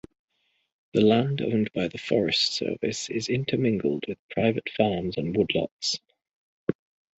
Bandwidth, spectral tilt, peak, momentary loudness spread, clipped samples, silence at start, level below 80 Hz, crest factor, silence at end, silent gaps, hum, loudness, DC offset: 8.2 kHz; -5 dB/octave; -6 dBFS; 11 LU; under 0.1%; 0.95 s; -58 dBFS; 20 dB; 0.45 s; 4.19-4.29 s, 5.71-5.79 s, 6.33-6.67 s; none; -26 LUFS; under 0.1%